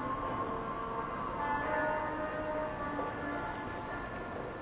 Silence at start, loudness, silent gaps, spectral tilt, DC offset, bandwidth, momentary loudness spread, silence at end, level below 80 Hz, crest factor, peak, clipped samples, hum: 0 s; -37 LUFS; none; -4.5 dB/octave; under 0.1%; 4 kHz; 7 LU; 0 s; -54 dBFS; 14 dB; -22 dBFS; under 0.1%; none